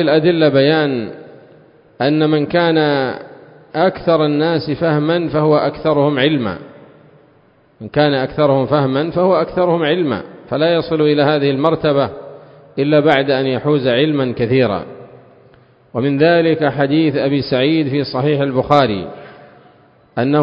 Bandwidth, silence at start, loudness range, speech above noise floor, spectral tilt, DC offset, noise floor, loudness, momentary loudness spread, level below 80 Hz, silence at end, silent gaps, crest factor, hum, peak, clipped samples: 5.4 kHz; 0 s; 2 LU; 37 dB; -9 dB/octave; under 0.1%; -51 dBFS; -15 LUFS; 11 LU; -50 dBFS; 0 s; none; 16 dB; none; 0 dBFS; under 0.1%